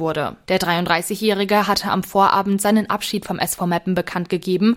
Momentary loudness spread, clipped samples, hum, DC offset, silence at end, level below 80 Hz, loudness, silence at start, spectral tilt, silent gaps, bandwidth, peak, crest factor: 7 LU; under 0.1%; none; under 0.1%; 0 s; -52 dBFS; -19 LUFS; 0 s; -4.5 dB/octave; none; 16.5 kHz; -2 dBFS; 18 dB